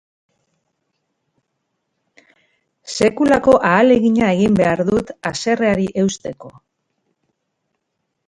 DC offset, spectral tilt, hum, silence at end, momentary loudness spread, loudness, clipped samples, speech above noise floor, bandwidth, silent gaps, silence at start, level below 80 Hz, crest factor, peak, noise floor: under 0.1%; -5.5 dB/octave; none; 1.75 s; 13 LU; -15 LUFS; under 0.1%; 59 dB; 11 kHz; none; 2.85 s; -48 dBFS; 18 dB; 0 dBFS; -74 dBFS